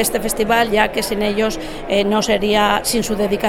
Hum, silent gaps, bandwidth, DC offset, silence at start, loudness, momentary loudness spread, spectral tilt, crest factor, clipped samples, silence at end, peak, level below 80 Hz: none; none; 17 kHz; under 0.1%; 0 s; -17 LUFS; 5 LU; -3.5 dB/octave; 16 dB; under 0.1%; 0 s; -2 dBFS; -34 dBFS